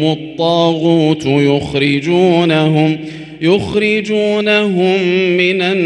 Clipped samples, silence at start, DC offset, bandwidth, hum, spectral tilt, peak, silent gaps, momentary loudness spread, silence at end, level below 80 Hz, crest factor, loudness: under 0.1%; 0 s; under 0.1%; 9.6 kHz; none; -6.5 dB/octave; 0 dBFS; none; 4 LU; 0 s; -48 dBFS; 12 dB; -13 LUFS